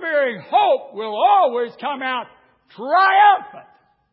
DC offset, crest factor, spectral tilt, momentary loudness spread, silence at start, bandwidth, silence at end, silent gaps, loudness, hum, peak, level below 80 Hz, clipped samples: under 0.1%; 16 dB; -8 dB/octave; 12 LU; 0 s; 5.4 kHz; 0.5 s; none; -17 LUFS; none; -2 dBFS; -78 dBFS; under 0.1%